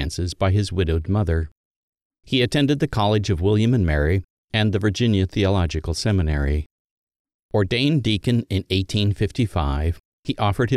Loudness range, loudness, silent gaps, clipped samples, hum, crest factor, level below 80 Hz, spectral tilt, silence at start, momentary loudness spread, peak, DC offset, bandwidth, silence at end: 2 LU; -21 LUFS; 1.52-1.93 s, 2.02-2.10 s, 4.24-4.48 s, 6.66-7.07 s, 7.16-7.25 s, 7.34-7.49 s, 10.00-10.23 s; under 0.1%; none; 16 dB; -32 dBFS; -6.5 dB/octave; 0 s; 7 LU; -6 dBFS; under 0.1%; 12.5 kHz; 0 s